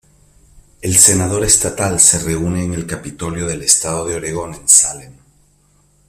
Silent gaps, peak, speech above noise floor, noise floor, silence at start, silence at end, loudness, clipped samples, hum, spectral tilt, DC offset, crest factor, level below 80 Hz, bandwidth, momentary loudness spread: none; 0 dBFS; 39 dB; -55 dBFS; 0.55 s; 0.95 s; -12 LUFS; 0.1%; none; -2.5 dB/octave; under 0.1%; 16 dB; -40 dBFS; over 20 kHz; 15 LU